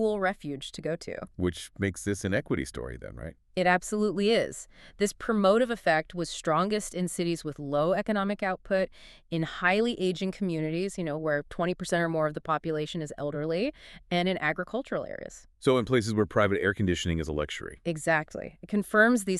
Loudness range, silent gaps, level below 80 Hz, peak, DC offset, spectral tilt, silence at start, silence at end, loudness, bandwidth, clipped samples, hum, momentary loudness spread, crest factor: 4 LU; none; -52 dBFS; -8 dBFS; under 0.1%; -5 dB/octave; 0 s; 0 s; -29 LUFS; 13.5 kHz; under 0.1%; none; 10 LU; 20 dB